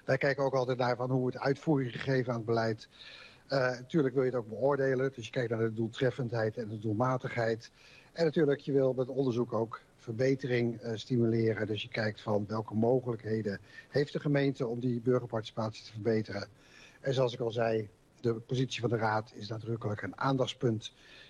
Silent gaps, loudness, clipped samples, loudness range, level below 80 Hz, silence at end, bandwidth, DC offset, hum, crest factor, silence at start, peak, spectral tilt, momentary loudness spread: none; -32 LUFS; under 0.1%; 2 LU; -68 dBFS; 0.05 s; 9.8 kHz; under 0.1%; none; 16 dB; 0.05 s; -16 dBFS; -7 dB/octave; 9 LU